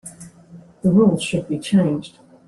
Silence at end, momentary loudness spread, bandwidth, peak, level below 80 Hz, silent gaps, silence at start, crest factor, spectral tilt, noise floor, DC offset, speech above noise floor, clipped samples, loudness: 0.4 s; 11 LU; 12 kHz; -4 dBFS; -54 dBFS; none; 0.05 s; 16 dB; -6.5 dB/octave; -44 dBFS; under 0.1%; 27 dB; under 0.1%; -19 LUFS